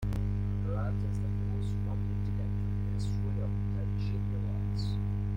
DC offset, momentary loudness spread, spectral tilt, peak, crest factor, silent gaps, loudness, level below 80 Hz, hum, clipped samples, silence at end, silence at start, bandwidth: under 0.1%; 1 LU; -8.5 dB/octave; -22 dBFS; 10 dB; none; -33 LUFS; -38 dBFS; 50 Hz at -30 dBFS; under 0.1%; 0 s; 0 s; 8.4 kHz